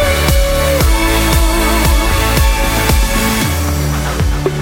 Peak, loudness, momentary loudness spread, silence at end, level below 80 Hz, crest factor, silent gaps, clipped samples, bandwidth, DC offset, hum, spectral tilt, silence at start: 0 dBFS; -13 LUFS; 4 LU; 0 s; -14 dBFS; 12 dB; none; under 0.1%; 17 kHz; under 0.1%; none; -4.5 dB/octave; 0 s